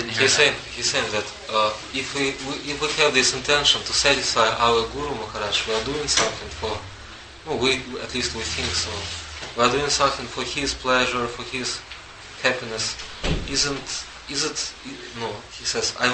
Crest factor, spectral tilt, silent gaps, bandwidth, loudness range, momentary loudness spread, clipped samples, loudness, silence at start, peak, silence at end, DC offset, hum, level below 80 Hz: 22 dB; -2 dB/octave; none; 8.8 kHz; 6 LU; 13 LU; under 0.1%; -22 LUFS; 0 s; -2 dBFS; 0 s; under 0.1%; none; -42 dBFS